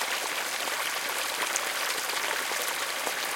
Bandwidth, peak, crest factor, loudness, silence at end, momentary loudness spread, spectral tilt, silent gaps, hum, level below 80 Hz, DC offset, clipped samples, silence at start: 17 kHz; -8 dBFS; 22 dB; -28 LUFS; 0 s; 2 LU; 1.5 dB/octave; none; none; -74 dBFS; under 0.1%; under 0.1%; 0 s